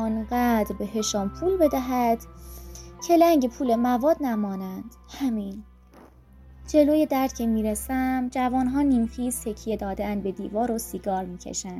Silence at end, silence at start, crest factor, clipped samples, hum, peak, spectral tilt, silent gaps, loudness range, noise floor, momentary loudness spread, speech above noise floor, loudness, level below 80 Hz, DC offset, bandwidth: 0 s; 0 s; 18 dB; under 0.1%; none; -6 dBFS; -5 dB/octave; none; 3 LU; -51 dBFS; 14 LU; 27 dB; -25 LUFS; -44 dBFS; under 0.1%; 16 kHz